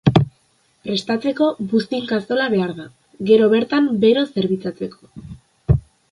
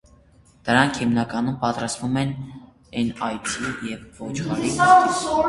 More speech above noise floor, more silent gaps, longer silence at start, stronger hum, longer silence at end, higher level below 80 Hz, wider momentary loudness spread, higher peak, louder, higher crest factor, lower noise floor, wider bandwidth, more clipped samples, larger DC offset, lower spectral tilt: first, 42 dB vs 32 dB; neither; second, 0.05 s vs 0.65 s; neither; first, 0.3 s vs 0 s; first, -38 dBFS vs -50 dBFS; about the same, 16 LU vs 18 LU; about the same, 0 dBFS vs 0 dBFS; about the same, -19 LUFS vs -21 LUFS; about the same, 18 dB vs 22 dB; first, -61 dBFS vs -54 dBFS; about the same, 11 kHz vs 11.5 kHz; neither; neither; first, -7.5 dB/octave vs -4.5 dB/octave